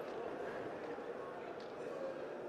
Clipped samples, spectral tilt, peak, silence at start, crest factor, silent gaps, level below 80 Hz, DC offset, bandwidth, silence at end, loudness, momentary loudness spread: under 0.1%; -5.5 dB/octave; -32 dBFS; 0 s; 14 dB; none; -78 dBFS; under 0.1%; 13.5 kHz; 0 s; -46 LUFS; 3 LU